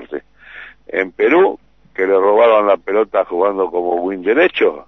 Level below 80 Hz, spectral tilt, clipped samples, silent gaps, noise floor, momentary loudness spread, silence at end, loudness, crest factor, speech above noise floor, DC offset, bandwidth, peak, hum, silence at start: -56 dBFS; -6.5 dB/octave; under 0.1%; none; -38 dBFS; 19 LU; 0.05 s; -15 LUFS; 14 dB; 24 dB; 0.2%; 6 kHz; -2 dBFS; none; 0 s